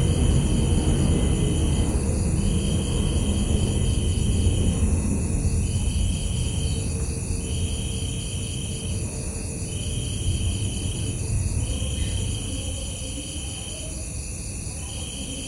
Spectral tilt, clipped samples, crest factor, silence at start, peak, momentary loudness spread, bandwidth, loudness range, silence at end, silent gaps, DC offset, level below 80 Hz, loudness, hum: -5 dB/octave; under 0.1%; 14 dB; 0 s; -8 dBFS; 9 LU; 15 kHz; 5 LU; 0 s; none; under 0.1%; -28 dBFS; -26 LUFS; none